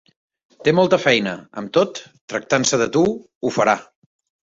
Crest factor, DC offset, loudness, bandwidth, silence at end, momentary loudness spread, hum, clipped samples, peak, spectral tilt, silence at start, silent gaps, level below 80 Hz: 18 dB; under 0.1%; -19 LUFS; 7.8 kHz; 0.7 s; 12 LU; none; under 0.1%; -2 dBFS; -4 dB/octave; 0.6 s; 2.21-2.28 s, 3.35-3.41 s; -60 dBFS